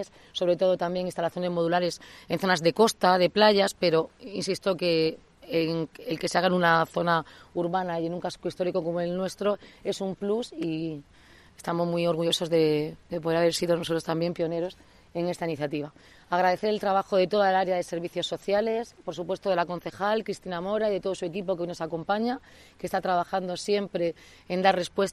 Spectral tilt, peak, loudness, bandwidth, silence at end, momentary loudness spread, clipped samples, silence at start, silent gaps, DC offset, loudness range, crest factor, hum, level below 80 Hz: -5 dB/octave; -6 dBFS; -27 LUFS; 13.5 kHz; 0 s; 11 LU; under 0.1%; 0 s; none; under 0.1%; 6 LU; 20 dB; none; -62 dBFS